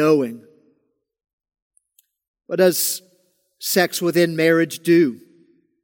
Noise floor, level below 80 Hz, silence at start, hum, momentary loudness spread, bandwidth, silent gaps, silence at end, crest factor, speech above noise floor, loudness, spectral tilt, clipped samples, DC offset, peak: -68 dBFS; -74 dBFS; 0 s; none; 12 LU; 17 kHz; 1.33-1.38 s, 1.62-1.71 s, 2.28-2.34 s; 0.65 s; 18 dB; 50 dB; -19 LUFS; -4.5 dB/octave; under 0.1%; under 0.1%; -2 dBFS